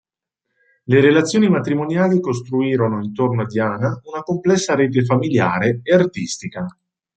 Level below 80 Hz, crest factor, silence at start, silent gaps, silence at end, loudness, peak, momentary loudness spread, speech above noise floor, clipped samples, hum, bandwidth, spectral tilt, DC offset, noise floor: -58 dBFS; 16 dB; 0.9 s; none; 0.45 s; -18 LUFS; -2 dBFS; 11 LU; 62 dB; under 0.1%; none; 9.2 kHz; -6 dB/octave; under 0.1%; -79 dBFS